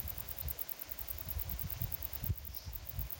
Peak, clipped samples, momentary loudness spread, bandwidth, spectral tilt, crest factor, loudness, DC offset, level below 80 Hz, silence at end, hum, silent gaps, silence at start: -22 dBFS; under 0.1%; 4 LU; 17.5 kHz; -4 dB/octave; 20 dB; -40 LUFS; under 0.1%; -48 dBFS; 0 s; none; none; 0 s